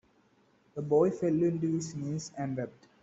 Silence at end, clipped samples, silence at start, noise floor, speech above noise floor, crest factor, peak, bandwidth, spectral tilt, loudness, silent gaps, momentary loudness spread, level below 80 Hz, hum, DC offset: 0.3 s; under 0.1%; 0.75 s; -67 dBFS; 37 dB; 18 dB; -14 dBFS; 8 kHz; -7.5 dB/octave; -31 LUFS; none; 13 LU; -68 dBFS; none; under 0.1%